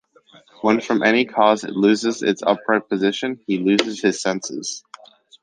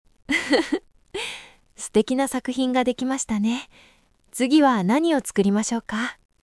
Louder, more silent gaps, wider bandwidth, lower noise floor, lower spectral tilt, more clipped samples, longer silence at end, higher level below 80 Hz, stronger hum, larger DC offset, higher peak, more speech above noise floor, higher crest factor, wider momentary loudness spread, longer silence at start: first, -19 LUFS vs -23 LUFS; neither; second, 9.8 kHz vs 12 kHz; about the same, -45 dBFS vs -42 dBFS; about the same, -4 dB/octave vs -4.5 dB/octave; neither; first, 0.65 s vs 0.3 s; second, -66 dBFS vs -56 dBFS; neither; neither; first, 0 dBFS vs -4 dBFS; first, 26 dB vs 21 dB; about the same, 20 dB vs 18 dB; second, 9 LU vs 13 LU; first, 0.65 s vs 0.3 s